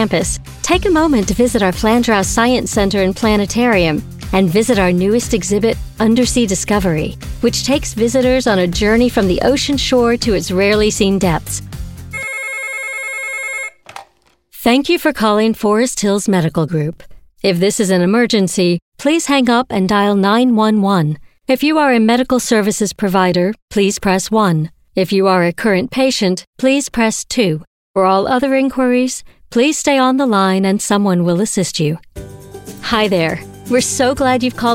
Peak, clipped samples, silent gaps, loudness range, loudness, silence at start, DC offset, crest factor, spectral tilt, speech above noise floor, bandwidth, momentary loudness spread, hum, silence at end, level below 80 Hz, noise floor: 0 dBFS; under 0.1%; 18.82-18.92 s, 23.62-23.68 s, 26.47-26.53 s, 27.67-27.94 s; 3 LU; -14 LUFS; 0 s; under 0.1%; 14 dB; -4.5 dB/octave; 41 dB; 17 kHz; 8 LU; none; 0 s; -34 dBFS; -55 dBFS